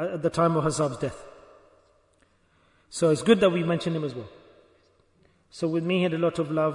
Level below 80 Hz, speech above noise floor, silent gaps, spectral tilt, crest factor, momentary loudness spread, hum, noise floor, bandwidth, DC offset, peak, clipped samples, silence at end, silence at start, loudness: -60 dBFS; 40 dB; none; -6 dB/octave; 22 dB; 14 LU; none; -64 dBFS; 11 kHz; under 0.1%; -6 dBFS; under 0.1%; 0 s; 0 s; -25 LUFS